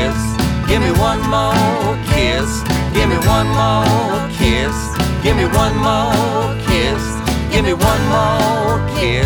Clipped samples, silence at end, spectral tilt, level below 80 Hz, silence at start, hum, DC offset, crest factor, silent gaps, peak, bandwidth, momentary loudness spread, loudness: under 0.1%; 0 s; -5.5 dB/octave; -24 dBFS; 0 s; none; under 0.1%; 14 dB; none; 0 dBFS; over 20 kHz; 4 LU; -15 LUFS